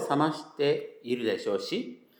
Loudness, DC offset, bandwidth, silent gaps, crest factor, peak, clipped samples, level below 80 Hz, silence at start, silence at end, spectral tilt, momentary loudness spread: -30 LUFS; under 0.1%; over 20 kHz; none; 18 dB; -12 dBFS; under 0.1%; -90 dBFS; 0 s; 0.25 s; -5.5 dB/octave; 7 LU